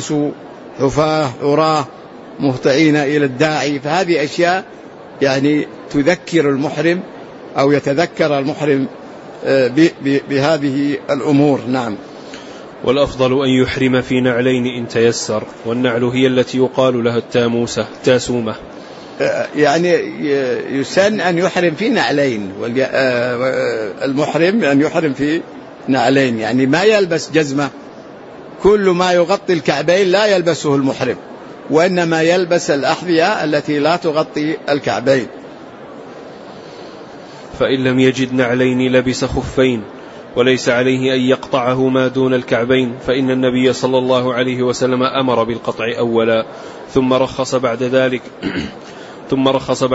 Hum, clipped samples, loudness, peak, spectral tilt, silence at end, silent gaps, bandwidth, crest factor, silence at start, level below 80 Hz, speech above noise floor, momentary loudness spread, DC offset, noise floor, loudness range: none; under 0.1%; -15 LUFS; 0 dBFS; -5.5 dB/octave; 0 s; none; 8 kHz; 14 dB; 0 s; -46 dBFS; 20 dB; 19 LU; under 0.1%; -34 dBFS; 2 LU